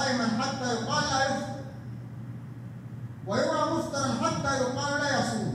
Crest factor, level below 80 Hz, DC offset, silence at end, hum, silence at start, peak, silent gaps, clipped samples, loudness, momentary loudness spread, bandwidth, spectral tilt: 16 dB; -60 dBFS; under 0.1%; 0 s; none; 0 s; -14 dBFS; none; under 0.1%; -28 LUFS; 14 LU; 15 kHz; -4.5 dB/octave